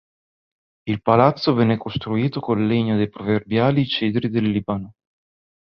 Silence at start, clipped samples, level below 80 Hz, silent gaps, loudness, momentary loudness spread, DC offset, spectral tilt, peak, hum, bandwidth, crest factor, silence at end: 0.85 s; under 0.1%; -52 dBFS; none; -20 LUFS; 10 LU; under 0.1%; -9 dB/octave; -2 dBFS; none; 6 kHz; 20 dB; 0.75 s